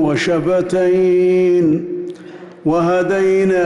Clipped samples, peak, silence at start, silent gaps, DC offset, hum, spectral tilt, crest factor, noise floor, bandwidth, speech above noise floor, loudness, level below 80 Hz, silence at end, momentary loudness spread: under 0.1%; -8 dBFS; 0 s; none; under 0.1%; none; -7 dB/octave; 8 dB; -35 dBFS; 11 kHz; 21 dB; -15 LUFS; -52 dBFS; 0 s; 13 LU